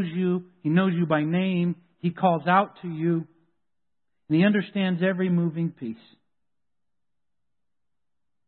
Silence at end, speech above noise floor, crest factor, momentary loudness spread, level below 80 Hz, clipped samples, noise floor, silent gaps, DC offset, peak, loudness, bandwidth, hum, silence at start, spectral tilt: 2.5 s; 63 dB; 20 dB; 10 LU; -72 dBFS; under 0.1%; -87 dBFS; none; under 0.1%; -6 dBFS; -25 LUFS; 4.3 kHz; none; 0 s; -11.5 dB/octave